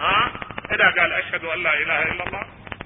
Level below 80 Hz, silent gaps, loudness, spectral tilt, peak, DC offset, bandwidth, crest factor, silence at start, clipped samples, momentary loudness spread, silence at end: -48 dBFS; none; -20 LUFS; -8 dB/octave; -2 dBFS; under 0.1%; 4 kHz; 20 dB; 0 s; under 0.1%; 15 LU; 0 s